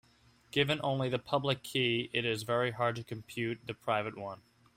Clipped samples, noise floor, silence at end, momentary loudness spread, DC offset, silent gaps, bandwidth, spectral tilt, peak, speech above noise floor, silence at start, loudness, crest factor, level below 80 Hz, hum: under 0.1%; -65 dBFS; 0.4 s; 11 LU; under 0.1%; none; 16 kHz; -5 dB/octave; -14 dBFS; 32 dB; 0.55 s; -33 LUFS; 20 dB; -68 dBFS; none